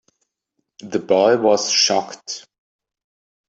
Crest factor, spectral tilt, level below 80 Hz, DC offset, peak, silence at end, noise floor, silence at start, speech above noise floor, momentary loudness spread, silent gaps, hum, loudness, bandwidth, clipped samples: 18 dB; -2.5 dB/octave; -70 dBFS; under 0.1%; -2 dBFS; 1.1 s; -75 dBFS; 0.85 s; 57 dB; 16 LU; none; none; -17 LUFS; 8.2 kHz; under 0.1%